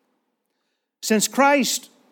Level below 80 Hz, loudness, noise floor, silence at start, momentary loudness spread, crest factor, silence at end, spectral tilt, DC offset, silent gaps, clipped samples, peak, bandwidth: -86 dBFS; -19 LUFS; -76 dBFS; 1.05 s; 10 LU; 18 dB; 0.3 s; -2.5 dB/octave; under 0.1%; none; under 0.1%; -6 dBFS; 19 kHz